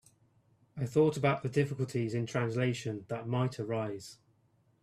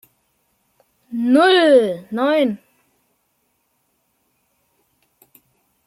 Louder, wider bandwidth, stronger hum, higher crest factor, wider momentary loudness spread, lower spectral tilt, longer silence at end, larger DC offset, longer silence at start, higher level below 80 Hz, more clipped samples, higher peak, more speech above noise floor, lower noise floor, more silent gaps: second, -33 LUFS vs -16 LUFS; about the same, 13.5 kHz vs 14.5 kHz; neither; about the same, 18 dB vs 18 dB; second, 11 LU vs 14 LU; first, -7 dB/octave vs -5 dB/octave; second, 0.7 s vs 3.3 s; neither; second, 0.75 s vs 1.1 s; about the same, -68 dBFS vs -72 dBFS; neither; second, -16 dBFS vs -2 dBFS; second, 38 dB vs 53 dB; about the same, -70 dBFS vs -68 dBFS; neither